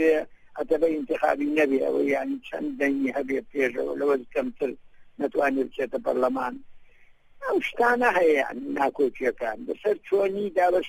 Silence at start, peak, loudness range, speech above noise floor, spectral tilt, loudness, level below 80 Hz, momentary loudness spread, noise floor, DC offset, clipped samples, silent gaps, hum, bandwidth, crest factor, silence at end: 0 s; -10 dBFS; 4 LU; 28 dB; -5.5 dB/octave; -26 LUFS; -58 dBFS; 10 LU; -53 dBFS; under 0.1%; under 0.1%; none; none; 16 kHz; 16 dB; 0 s